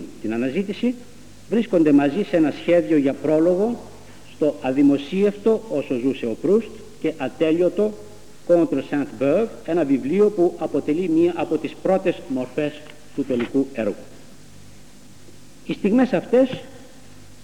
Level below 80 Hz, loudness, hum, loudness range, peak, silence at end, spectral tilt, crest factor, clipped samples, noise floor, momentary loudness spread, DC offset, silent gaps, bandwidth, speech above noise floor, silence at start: -56 dBFS; -21 LUFS; 50 Hz at -55 dBFS; 5 LU; -6 dBFS; 0.6 s; -7 dB/octave; 16 dB; under 0.1%; -47 dBFS; 10 LU; 0.8%; none; 12 kHz; 27 dB; 0 s